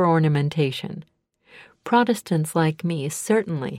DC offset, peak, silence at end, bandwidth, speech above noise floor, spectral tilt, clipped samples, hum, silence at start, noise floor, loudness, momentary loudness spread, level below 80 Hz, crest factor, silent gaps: under 0.1%; -6 dBFS; 0 s; 15.5 kHz; 30 dB; -6 dB/octave; under 0.1%; none; 0 s; -51 dBFS; -22 LUFS; 13 LU; -64 dBFS; 16 dB; none